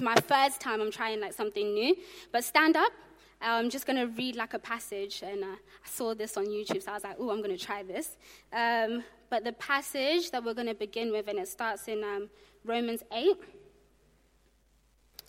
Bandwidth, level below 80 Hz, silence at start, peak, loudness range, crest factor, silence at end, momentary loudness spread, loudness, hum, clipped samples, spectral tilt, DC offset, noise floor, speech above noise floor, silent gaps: 16.5 kHz; -68 dBFS; 0 s; -6 dBFS; 6 LU; 26 dB; 1.7 s; 12 LU; -31 LUFS; none; under 0.1%; -3 dB/octave; under 0.1%; -67 dBFS; 35 dB; none